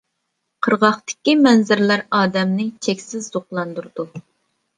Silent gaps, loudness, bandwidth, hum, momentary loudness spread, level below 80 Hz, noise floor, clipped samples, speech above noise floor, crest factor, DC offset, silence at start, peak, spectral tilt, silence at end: none; -18 LUFS; 9.8 kHz; none; 15 LU; -66 dBFS; -74 dBFS; under 0.1%; 56 dB; 18 dB; under 0.1%; 0.6 s; -2 dBFS; -5 dB/octave; 0.55 s